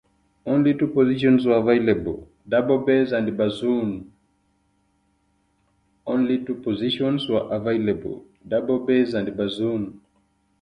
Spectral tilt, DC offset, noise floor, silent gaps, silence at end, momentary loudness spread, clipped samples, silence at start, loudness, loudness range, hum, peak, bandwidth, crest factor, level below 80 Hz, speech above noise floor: -8 dB/octave; under 0.1%; -67 dBFS; none; 0.65 s; 11 LU; under 0.1%; 0.45 s; -22 LUFS; 8 LU; none; -4 dBFS; 9.8 kHz; 18 dB; -54 dBFS; 45 dB